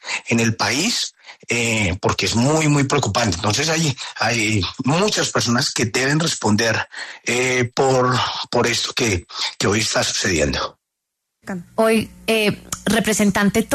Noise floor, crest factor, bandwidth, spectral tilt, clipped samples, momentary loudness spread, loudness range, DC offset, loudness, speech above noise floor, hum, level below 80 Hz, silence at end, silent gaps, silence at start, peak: -79 dBFS; 14 dB; 13.5 kHz; -3.5 dB/octave; under 0.1%; 5 LU; 2 LU; under 0.1%; -18 LUFS; 60 dB; none; -44 dBFS; 0 s; none; 0.05 s; -4 dBFS